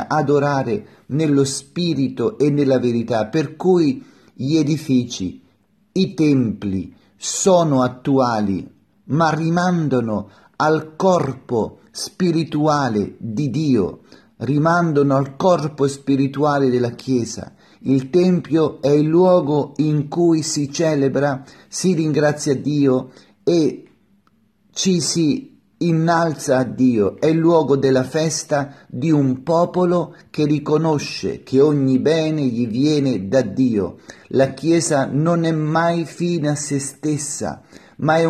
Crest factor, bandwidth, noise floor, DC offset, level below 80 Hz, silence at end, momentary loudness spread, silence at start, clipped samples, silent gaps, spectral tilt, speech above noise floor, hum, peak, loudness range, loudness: 16 dB; 13 kHz; -59 dBFS; under 0.1%; -58 dBFS; 0 s; 9 LU; 0 s; under 0.1%; none; -6 dB/octave; 42 dB; none; -2 dBFS; 3 LU; -18 LUFS